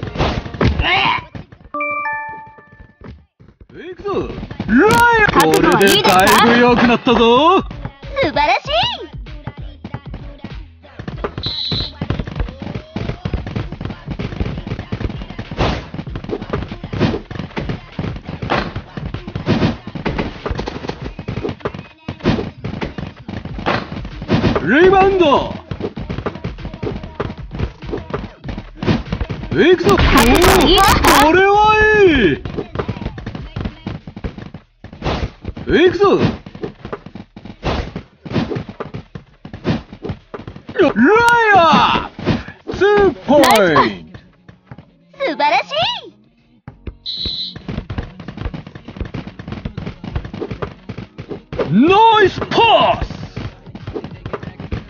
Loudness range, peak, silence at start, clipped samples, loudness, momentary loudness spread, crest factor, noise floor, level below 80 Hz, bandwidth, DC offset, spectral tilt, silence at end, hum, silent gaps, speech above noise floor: 14 LU; 0 dBFS; 0 s; under 0.1%; -15 LUFS; 21 LU; 16 dB; -52 dBFS; -30 dBFS; 9.4 kHz; under 0.1%; -5 dB/octave; 0 s; none; none; 41 dB